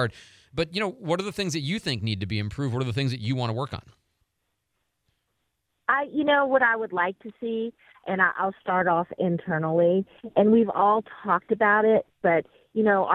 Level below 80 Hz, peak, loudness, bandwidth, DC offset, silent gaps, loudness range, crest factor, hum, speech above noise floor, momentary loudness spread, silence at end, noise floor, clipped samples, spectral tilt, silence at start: -58 dBFS; -6 dBFS; -25 LUFS; 13 kHz; under 0.1%; none; 8 LU; 18 dB; none; 53 dB; 11 LU; 0 s; -78 dBFS; under 0.1%; -6 dB/octave; 0 s